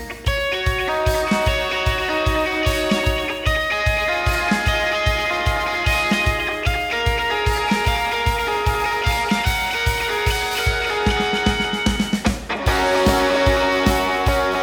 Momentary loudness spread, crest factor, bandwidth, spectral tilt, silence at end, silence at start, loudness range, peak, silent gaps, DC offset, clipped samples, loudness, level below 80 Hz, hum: 4 LU; 16 dB; over 20 kHz; -4.5 dB/octave; 0 s; 0 s; 1 LU; -4 dBFS; none; under 0.1%; under 0.1%; -19 LUFS; -28 dBFS; none